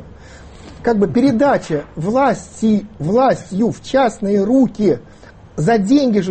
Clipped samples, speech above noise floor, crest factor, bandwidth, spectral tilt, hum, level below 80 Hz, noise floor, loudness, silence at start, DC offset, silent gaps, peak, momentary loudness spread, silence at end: under 0.1%; 23 dB; 12 dB; 8.8 kHz; -7 dB/octave; none; -44 dBFS; -38 dBFS; -16 LUFS; 0 s; under 0.1%; none; -2 dBFS; 7 LU; 0 s